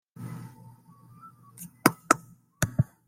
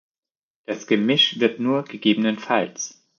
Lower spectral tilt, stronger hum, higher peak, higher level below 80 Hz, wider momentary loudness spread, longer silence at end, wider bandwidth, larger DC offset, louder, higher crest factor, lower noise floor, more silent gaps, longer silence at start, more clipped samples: about the same, -4.5 dB/octave vs -4 dB/octave; neither; first, 0 dBFS vs -4 dBFS; first, -58 dBFS vs -74 dBFS; first, 21 LU vs 14 LU; about the same, 0.25 s vs 0.3 s; first, 16.5 kHz vs 7.2 kHz; neither; second, -27 LUFS vs -20 LUFS; first, 30 dB vs 18 dB; second, -54 dBFS vs under -90 dBFS; neither; second, 0.2 s vs 0.7 s; neither